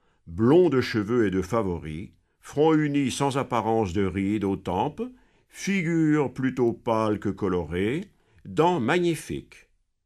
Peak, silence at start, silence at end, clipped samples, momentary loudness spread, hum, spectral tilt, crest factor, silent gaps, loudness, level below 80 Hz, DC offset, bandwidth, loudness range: -8 dBFS; 0.25 s; 0.65 s; under 0.1%; 13 LU; none; -6.5 dB/octave; 18 dB; none; -25 LUFS; -52 dBFS; under 0.1%; 13.5 kHz; 2 LU